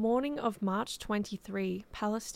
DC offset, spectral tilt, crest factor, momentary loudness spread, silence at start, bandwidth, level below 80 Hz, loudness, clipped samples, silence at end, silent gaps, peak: under 0.1%; -5 dB/octave; 16 dB; 5 LU; 0 s; 16 kHz; -60 dBFS; -34 LUFS; under 0.1%; 0 s; none; -16 dBFS